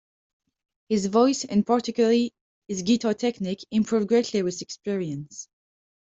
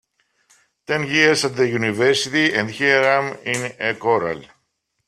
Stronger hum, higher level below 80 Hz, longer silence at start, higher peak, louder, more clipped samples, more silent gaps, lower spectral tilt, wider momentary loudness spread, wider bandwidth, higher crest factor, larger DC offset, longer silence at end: neither; about the same, -66 dBFS vs -62 dBFS; about the same, 0.9 s vs 0.9 s; second, -6 dBFS vs 0 dBFS; second, -24 LUFS vs -18 LUFS; neither; first, 2.41-2.62 s vs none; about the same, -5 dB/octave vs -4 dB/octave; first, 12 LU vs 9 LU; second, 8 kHz vs 14 kHz; about the same, 18 dB vs 20 dB; neither; about the same, 0.7 s vs 0.65 s